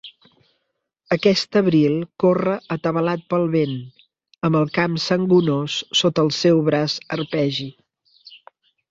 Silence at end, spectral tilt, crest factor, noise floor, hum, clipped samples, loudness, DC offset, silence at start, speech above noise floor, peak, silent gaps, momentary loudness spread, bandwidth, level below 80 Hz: 0.55 s; -6 dB/octave; 18 dB; -75 dBFS; none; under 0.1%; -20 LUFS; under 0.1%; 0.05 s; 56 dB; -2 dBFS; none; 8 LU; 7.8 kHz; -60 dBFS